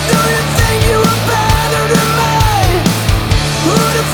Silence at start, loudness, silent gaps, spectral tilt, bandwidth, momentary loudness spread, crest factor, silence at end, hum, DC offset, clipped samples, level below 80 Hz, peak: 0 s; -12 LUFS; none; -4.5 dB/octave; over 20 kHz; 2 LU; 10 dB; 0 s; none; under 0.1%; under 0.1%; -22 dBFS; -2 dBFS